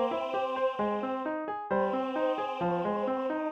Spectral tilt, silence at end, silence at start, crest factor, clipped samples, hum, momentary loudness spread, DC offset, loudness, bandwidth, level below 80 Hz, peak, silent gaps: -7.5 dB/octave; 0 s; 0 s; 12 dB; under 0.1%; none; 3 LU; under 0.1%; -31 LUFS; 7 kHz; -68 dBFS; -18 dBFS; none